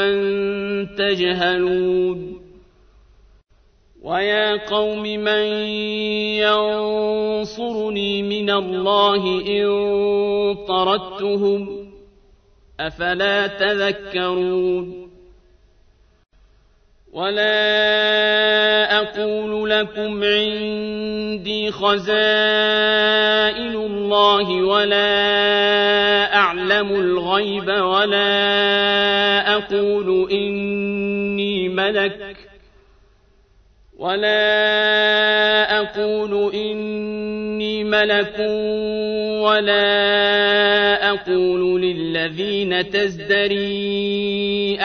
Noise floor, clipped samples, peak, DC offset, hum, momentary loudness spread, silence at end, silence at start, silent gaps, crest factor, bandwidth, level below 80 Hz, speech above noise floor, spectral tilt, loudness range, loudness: -55 dBFS; under 0.1%; 0 dBFS; under 0.1%; none; 9 LU; 0 s; 0 s; none; 18 dB; 6.6 kHz; -52 dBFS; 36 dB; -5 dB/octave; 7 LU; -18 LUFS